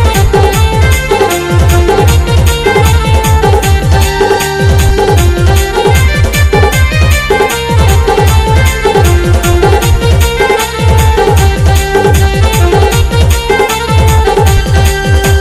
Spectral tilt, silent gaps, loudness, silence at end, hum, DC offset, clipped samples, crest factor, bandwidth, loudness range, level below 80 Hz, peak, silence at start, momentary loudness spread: -5 dB/octave; none; -8 LUFS; 0 s; none; under 0.1%; 1%; 6 dB; 16 kHz; 0 LU; -14 dBFS; 0 dBFS; 0 s; 2 LU